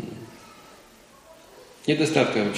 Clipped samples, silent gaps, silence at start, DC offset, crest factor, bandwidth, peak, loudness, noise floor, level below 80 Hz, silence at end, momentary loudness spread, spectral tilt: under 0.1%; none; 0 s; under 0.1%; 24 dB; 15.5 kHz; -4 dBFS; -23 LUFS; -52 dBFS; -64 dBFS; 0 s; 25 LU; -5 dB/octave